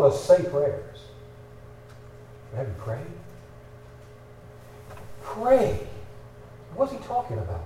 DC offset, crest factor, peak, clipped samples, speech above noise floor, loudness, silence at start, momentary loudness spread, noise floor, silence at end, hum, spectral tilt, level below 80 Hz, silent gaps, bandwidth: under 0.1%; 22 dB; -6 dBFS; under 0.1%; 22 dB; -25 LUFS; 0 s; 27 LU; -47 dBFS; 0 s; none; -7 dB/octave; -50 dBFS; none; 14 kHz